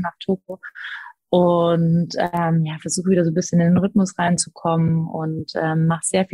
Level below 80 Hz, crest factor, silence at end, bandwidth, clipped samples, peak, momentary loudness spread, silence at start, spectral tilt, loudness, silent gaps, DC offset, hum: -56 dBFS; 16 dB; 0.05 s; 11.5 kHz; under 0.1%; -4 dBFS; 10 LU; 0 s; -6 dB/octave; -20 LUFS; none; under 0.1%; none